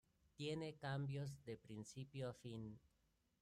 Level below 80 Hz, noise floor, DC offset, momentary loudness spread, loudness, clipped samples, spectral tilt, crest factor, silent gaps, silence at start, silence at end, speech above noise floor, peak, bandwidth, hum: -76 dBFS; -83 dBFS; under 0.1%; 9 LU; -51 LUFS; under 0.1%; -6 dB/octave; 16 dB; none; 0.4 s; 0.65 s; 33 dB; -36 dBFS; 12.5 kHz; none